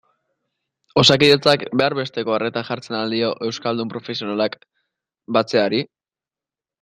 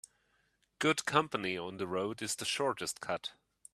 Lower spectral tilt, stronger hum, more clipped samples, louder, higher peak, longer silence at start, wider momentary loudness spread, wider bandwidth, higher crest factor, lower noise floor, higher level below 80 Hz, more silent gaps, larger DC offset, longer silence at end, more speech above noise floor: first, -4.5 dB/octave vs -3 dB/octave; neither; neither; first, -19 LUFS vs -34 LUFS; first, 0 dBFS vs -10 dBFS; first, 0.95 s vs 0.8 s; first, 13 LU vs 8 LU; about the same, 13.5 kHz vs 14 kHz; second, 20 dB vs 26 dB; first, under -90 dBFS vs -75 dBFS; first, -58 dBFS vs -74 dBFS; neither; neither; first, 0.95 s vs 0.45 s; first, over 71 dB vs 40 dB